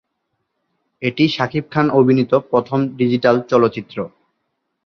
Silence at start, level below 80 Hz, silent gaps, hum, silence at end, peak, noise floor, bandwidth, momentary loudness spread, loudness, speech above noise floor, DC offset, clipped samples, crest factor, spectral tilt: 1 s; -58 dBFS; none; none; 0.8 s; -2 dBFS; -73 dBFS; 6.6 kHz; 12 LU; -17 LUFS; 57 dB; under 0.1%; under 0.1%; 16 dB; -7.5 dB/octave